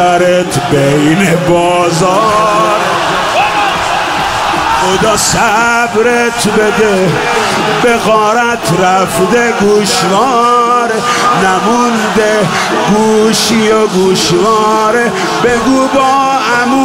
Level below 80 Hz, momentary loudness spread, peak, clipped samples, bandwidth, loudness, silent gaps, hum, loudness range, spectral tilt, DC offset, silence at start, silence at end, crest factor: -38 dBFS; 3 LU; 0 dBFS; under 0.1%; 16.5 kHz; -9 LUFS; none; none; 1 LU; -4 dB/octave; 0.2%; 0 s; 0 s; 10 dB